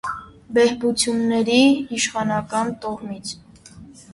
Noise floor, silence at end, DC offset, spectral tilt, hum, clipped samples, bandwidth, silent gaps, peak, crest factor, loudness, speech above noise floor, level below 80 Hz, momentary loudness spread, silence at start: -44 dBFS; 0 s; under 0.1%; -3.5 dB/octave; none; under 0.1%; 11.5 kHz; none; -4 dBFS; 16 dB; -20 LUFS; 24 dB; -54 dBFS; 16 LU; 0.05 s